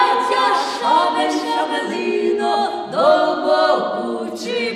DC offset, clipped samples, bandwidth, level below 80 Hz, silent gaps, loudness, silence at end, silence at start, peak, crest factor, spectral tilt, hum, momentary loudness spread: under 0.1%; under 0.1%; 13.5 kHz; -66 dBFS; none; -18 LUFS; 0 s; 0 s; -4 dBFS; 14 dB; -3.5 dB/octave; none; 7 LU